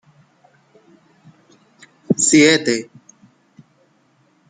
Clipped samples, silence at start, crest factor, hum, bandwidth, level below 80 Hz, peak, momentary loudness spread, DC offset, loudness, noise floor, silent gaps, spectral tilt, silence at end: under 0.1%; 2.1 s; 20 dB; none; 9.6 kHz; -64 dBFS; -2 dBFS; 13 LU; under 0.1%; -14 LUFS; -59 dBFS; none; -3 dB/octave; 1.65 s